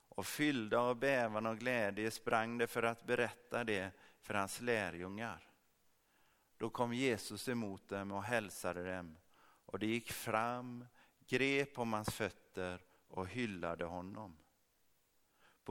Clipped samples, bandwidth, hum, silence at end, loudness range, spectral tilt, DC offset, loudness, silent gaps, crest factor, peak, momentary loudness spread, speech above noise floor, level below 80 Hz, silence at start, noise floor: under 0.1%; 18.5 kHz; none; 0 s; 6 LU; -4.5 dB/octave; under 0.1%; -39 LUFS; none; 24 dB; -18 dBFS; 13 LU; 37 dB; -72 dBFS; 0.15 s; -76 dBFS